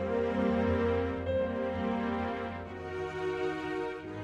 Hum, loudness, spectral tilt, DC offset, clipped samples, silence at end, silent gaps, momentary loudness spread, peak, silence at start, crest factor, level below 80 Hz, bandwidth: none; -33 LUFS; -7.5 dB/octave; under 0.1%; under 0.1%; 0 s; none; 9 LU; -18 dBFS; 0 s; 14 dB; -50 dBFS; 9 kHz